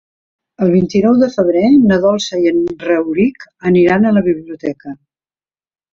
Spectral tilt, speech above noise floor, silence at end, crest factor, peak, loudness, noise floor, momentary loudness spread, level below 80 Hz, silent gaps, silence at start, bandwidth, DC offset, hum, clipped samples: -7 dB/octave; over 78 dB; 1 s; 12 dB; -2 dBFS; -13 LUFS; under -90 dBFS; 12 LU; -50 dBFS; none; 0.6 s; 7.4 kHz; under 0.1%; none; under 0.1%